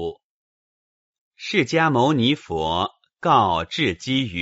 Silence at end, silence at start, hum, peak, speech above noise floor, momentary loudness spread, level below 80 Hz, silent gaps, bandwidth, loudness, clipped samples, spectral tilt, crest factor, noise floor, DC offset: 0 s; 0 s; none; -4 dBFS; over 70 dB; 9 LU; -50 dBFS; 0.24-1.14 s, 1.21-1.31 s; 8 kHz; -21 LUFS; under 0.1%; -3.5 dB/octave; 18 dB; under -90 dBFS; under 0.1%